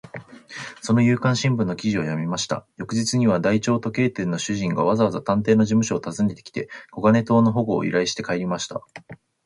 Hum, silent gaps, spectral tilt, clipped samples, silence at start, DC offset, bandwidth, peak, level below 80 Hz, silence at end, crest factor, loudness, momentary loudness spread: none; none; -5.5 dB/octave; under 0.1%; 0.05 s; under 0.1%; 11.5 kHz; -6 dBFS; -56 dBFS; 0.3 s; 16 dB; -22 LUFS; 14 LU